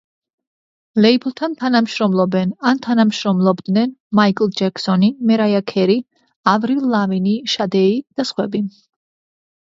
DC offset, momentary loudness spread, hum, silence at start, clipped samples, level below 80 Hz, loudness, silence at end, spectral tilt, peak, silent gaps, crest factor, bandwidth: under 0.1%; 6 LU; none; 0.95 s; under 0.1%; -64 dBFS; -17 LUFS; 0.95 s; -6.5 dB/octave; 0 dBFS; 4.00-4.10 s, 6.36-6.43 s; 18 dB; 7.8 kHz